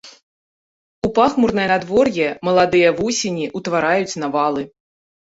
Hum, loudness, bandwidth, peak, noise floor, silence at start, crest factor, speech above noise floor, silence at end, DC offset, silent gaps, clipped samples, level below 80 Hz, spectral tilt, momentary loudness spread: none; -18 LUFS; 8 kHz; -2 dBFS; under -90 dBFS; 0.05 s; 16 dB; over 73 dB; 0.7 s; under 0.1%; 0.23-1.02 s; under 0.1%; -50 dBFS; -4.5 dB/octave; 8 LU